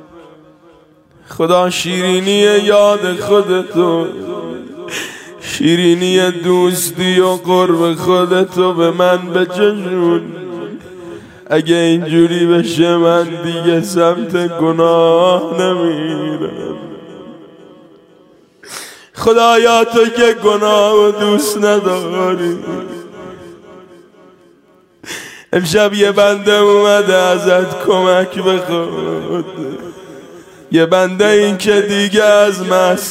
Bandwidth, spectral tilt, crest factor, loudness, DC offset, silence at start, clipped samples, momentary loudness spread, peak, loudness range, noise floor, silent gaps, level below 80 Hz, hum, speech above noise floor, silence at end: 16 kHz; -4.5 dB/octave; 14 dB; -12 LUFS; under 0.1%; 0.15 s; under 0.1%; 17 LU; 0 dBFS; 7 LU; -49 dBFS; none; -54 dBFS; none; 37 dB; 0 s